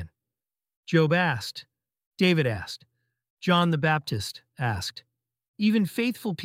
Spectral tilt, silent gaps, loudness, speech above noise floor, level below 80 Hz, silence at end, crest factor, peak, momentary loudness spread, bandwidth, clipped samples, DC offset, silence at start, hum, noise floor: -6 dB/octave; 0.76-0.83 s, 2.06-2.11 s, 3.30-3.37 s, 5.48-5.54 s; -26 LUFS; over 65 dB; -60 dBFS; 0 s; 20 dB; -6 dBFS; 15 LU; 16 kHz; under 0.1%; under 0.1%; 0 s; none; under -90 dBFS